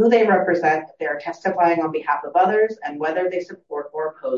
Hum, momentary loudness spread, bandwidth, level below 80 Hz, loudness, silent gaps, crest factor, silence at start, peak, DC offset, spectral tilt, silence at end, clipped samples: none; 11 LU; 7.2 kHz; -74 dBFS; -21 LUFS; none; 16 dB; 0 s; -4 dBFS; under 0.1%; -6.5 dB/octave; 0 s; under 0.1%